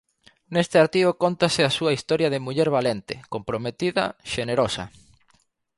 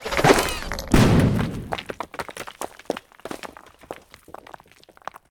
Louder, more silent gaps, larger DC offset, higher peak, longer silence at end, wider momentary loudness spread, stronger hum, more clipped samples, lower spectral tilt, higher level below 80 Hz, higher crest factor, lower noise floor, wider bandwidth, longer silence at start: about the same, -23 LUFS vs -22 LUFS; neither; neither; second, -6 dBFS vs -2 dBFS; about the same, 0.9 s vs 1 s; second, 11 LU vs 24 LU; neither; neither; about the same, -5 dB/octave vs -5.5 dB/octave; second, -56 dBFS vs -36 dBFS; about the same, 18 dB vs 22 dB; first, -65 dBFS vs -52 dBFS; second, 11.5 kHz vs 19.5 kHz; first, 0.5 s vs 0 s